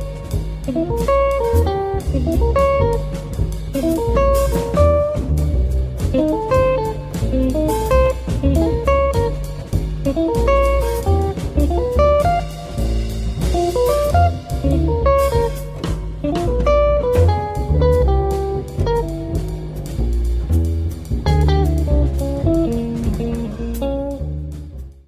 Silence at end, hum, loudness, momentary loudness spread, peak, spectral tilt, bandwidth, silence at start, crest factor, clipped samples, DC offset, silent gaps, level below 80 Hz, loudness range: 0.15 s; none; -18 LUFS; 9 LU; -2 dBFS; -7.5 dB/octave; 15.5 kHz; 0 s; 14 dB; under 0.1%; under 0.1%; none; -22 dBFS; 2 LU